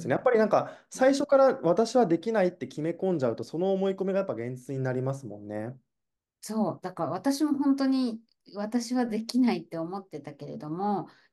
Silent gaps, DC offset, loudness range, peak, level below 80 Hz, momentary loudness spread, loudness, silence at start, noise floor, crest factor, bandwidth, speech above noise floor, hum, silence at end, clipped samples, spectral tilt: none; under 0.1%; 7 LU; -10 dBFS; -76 dBFS; 15 LU; -28 LUFS; 0 s; -86 dBFS; 18 dB; 12.5 kHz; 59 dB; none; 0.25 s; under 0.1%; -6 dB/octave